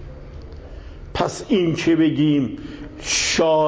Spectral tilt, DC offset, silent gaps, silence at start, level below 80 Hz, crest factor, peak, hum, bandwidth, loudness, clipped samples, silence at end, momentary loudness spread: -4.5 dB/octave; under 0.1%; none; 0 s; -40 dBFS; 16 dB; -6 dBFS; none; 8 kHz; -19 LUFS; under 0.1%; 0 s; 22 LU